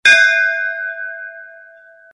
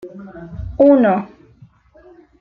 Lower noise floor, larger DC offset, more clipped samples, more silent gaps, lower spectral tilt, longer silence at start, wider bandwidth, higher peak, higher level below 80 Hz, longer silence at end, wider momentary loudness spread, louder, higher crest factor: second, -44 dBFS vs -48 dBFS; neither; neither; neither; second, 1.5 dB/octave vs -10 dB/octave; about the same, 0.05 s vs 0.05 s; first, 11.5 kHz vs 4.2 kHz; about the same, 0 dBFS vs -2 dBFS; second, -62 dBFS vs -42 dBFS; second, 0.6 s vs 1.15 s; about the same, 22 LU vs 24 LU; about the same, -14 LUFS vs -14 LUFS; about the same, 16 dB vs 16 dB